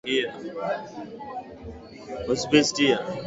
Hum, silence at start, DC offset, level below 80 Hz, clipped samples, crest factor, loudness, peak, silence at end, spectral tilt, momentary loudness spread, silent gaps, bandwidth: none; 0.05 s; under 0.1%; -54 dBFS; under 0.1%; 22 dB; -24 LUFS; -4 dBFS; 0 s; -3.5 dB/octave; 21 LU; none; 8 kHz